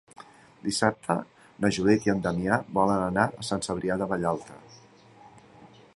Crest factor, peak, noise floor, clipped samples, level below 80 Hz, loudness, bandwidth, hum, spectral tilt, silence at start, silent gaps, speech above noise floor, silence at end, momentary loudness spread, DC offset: 22 dB; -6 dBFS; -53 dBFS; under 0.1%; -56 dBFS; -27 LUFS; 11.5 kHz; none; -5.5 dB/octave; 0.2 s; none; 27 dB; 0.3 s; 8 LU; under 0.1%